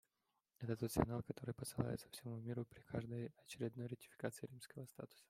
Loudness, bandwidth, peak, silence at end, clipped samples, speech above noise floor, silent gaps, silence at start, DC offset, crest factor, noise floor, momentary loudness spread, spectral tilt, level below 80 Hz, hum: -47 LUFS; 16 kHz; -20 dBFS; 0.05 s; under 0.1%; 42 dB; none; 0.6 s; under 0.1%; 26 dB; -88 dBFS; 13 LU; -6 dB/octave; -66 dBFS; none